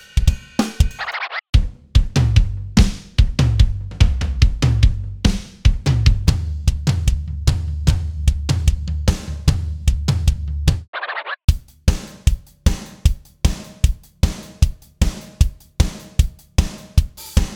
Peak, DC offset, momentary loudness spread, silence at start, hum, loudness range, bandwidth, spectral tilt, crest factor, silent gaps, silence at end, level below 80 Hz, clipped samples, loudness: 0 dBFS; under 0.1%; 6 LU; 0.15 s; none; 4 LU; 16.5 kHz; -5.5 dB/octave; 18 dB; 1.49-1.53 s, 10.88-10.93 s, 11.44-11.48 s; 0 s; -20 dBFS; under 0.1%; -20 LUFS